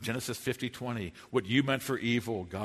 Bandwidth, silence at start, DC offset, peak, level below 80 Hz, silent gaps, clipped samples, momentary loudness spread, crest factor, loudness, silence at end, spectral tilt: 13.5 kHz; 0 s; under 0.1%; -12 dBFS; -62 dBFS; none; under 0.1%; 8 LU; 20 dB; -32 LUFS; 0 s; -5 dB/octave